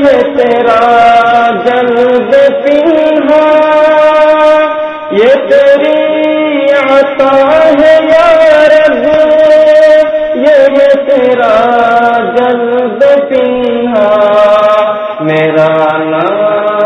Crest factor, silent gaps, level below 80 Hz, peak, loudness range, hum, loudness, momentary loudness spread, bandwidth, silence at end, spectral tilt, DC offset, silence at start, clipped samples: 6 dB; none; -44 dBFS; 0 dBFS; 3 LU; none; -6 LUFS; 5 LU; 8.6 kHz; 0 s; -6 dB/octave; under 0.1%; 0 s; 6%